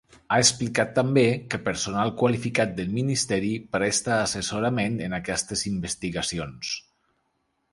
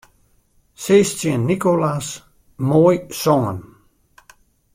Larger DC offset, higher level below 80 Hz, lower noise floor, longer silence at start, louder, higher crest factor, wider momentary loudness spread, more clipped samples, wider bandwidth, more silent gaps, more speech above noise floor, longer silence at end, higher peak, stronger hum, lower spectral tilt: neither; about the same, -52 dBFS vs -54 dBFS; first, -73 dBFS vs -59 dBFS; second, 0.3 s vs 0.8 s; second, -25 LUFS vs -18 LUFS; about the same, 20 dB vs 18 dB; second, 9 LU vs 15 LU; neither; second, 11.5 kHz vs 16.5 kHz; neither; first, 48 dB vs 42 dB; second, 0.95 s vs 1.15 s; second, -6 dBFS vs -2 dBFS; neither; second, -4 dB/octave vs -6 dB/octave